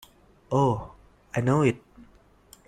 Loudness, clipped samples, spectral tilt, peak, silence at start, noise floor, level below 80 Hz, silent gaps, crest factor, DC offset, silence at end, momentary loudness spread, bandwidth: -26 LUFS; under 0.1%; -7.5 dB/octave; -8 dBFS; 0.5 s; -57 dBFS; -54 dBFS; none; 20 dB; under 0.1%; 0.9 s; 15 LU; 14 kHz